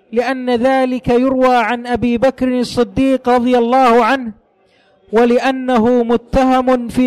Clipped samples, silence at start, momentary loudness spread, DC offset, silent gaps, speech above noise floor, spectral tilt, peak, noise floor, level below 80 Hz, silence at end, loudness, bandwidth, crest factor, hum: under 0.1%; 0.1 s; 6 LU; under 0.1%; none; 41 dB; -6 dB/octave; -6 dBFS; -54 dBFS; -38 dBFS; 0 s; -14 LUFS; 12.5 kHz; 8 dB; none